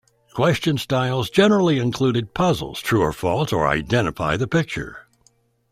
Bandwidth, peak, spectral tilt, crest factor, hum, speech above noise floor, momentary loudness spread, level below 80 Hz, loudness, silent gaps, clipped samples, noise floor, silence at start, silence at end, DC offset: 15.5 kHz; -2 dBFS; -6 dB/octave; 18 dB; none; 41 dB; 6 LU; -46 dBFS; -20 LUFS; none; under 0.1%; -61 dBFS; 0.35 s; 0.7 s; under 0.1%